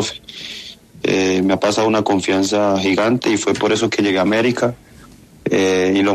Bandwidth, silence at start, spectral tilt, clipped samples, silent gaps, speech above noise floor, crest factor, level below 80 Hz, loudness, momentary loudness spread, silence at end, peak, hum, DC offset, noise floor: 13.5 kHz; 0 s; -4.5 dB/octave; under 0.1%; none; 27 dB; 14 dB; -54 dBFS; -17 LUFS; 13 LU; 0 s; -4 dBFS; none; under 0.1%; -43 dBFS